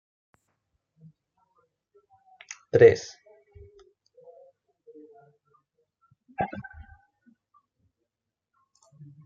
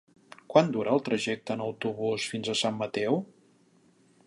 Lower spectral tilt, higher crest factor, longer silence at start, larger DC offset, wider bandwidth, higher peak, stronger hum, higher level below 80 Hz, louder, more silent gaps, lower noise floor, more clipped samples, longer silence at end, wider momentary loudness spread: about the same, -6 dB/octave vs -5 dB/octave; about the same, 26 dB vs 24 dB; first, 2.75 s vs 0.5 s; neither; second, 7.2 kHz vs 11.5 kHz; about the same, -4 dBFS vs -6 dBFS; neither; first, -64 dBFS vs -74 dBFS; first, -22 LUFS vs -29 LUFS; neither; first, -87 dBFS vs -63 dBFS; neither; first, 2.65 s vs 1 s; first, 27 LU vs 8 LU